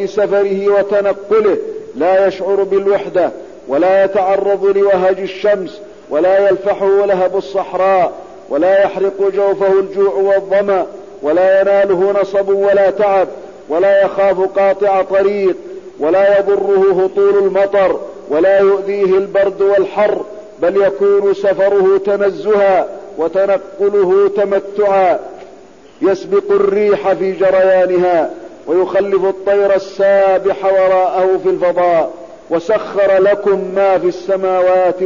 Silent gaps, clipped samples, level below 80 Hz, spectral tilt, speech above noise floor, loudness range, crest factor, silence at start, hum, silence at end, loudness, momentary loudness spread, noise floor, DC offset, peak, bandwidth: none; under 0.1%; -54 dBFS; -6.5 dB/octave; 27 dB; 2 LU; 8 dB; 0 s; none; 0 s; -13 LUFS; 7 LU; -39 dBFS; 0.4%; -4 dBFS; 7.2 kHz